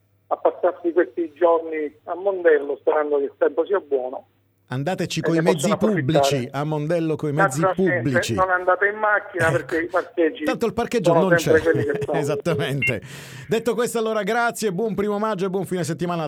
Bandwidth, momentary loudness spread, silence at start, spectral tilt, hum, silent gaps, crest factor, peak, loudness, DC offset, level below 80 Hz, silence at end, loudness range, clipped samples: 16.5 kHz; 7 LU; 0.3 s; -5.5 dB/octave; none; none; 18 dB; -4 dBFS; -21 LUFS; under 0.1%; -56 dBFS; 0 s; 3 LU; under 0.1%